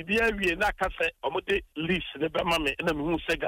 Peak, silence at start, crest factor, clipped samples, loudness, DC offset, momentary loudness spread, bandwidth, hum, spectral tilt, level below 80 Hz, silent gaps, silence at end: -16 dBFS; 0 s; 12 dB; under 0.1%; -28 LUFS; under 0.1%; 4 LU; 16 kHz; none; -4.5 dB/octave; -46 dBFS; none; 0 s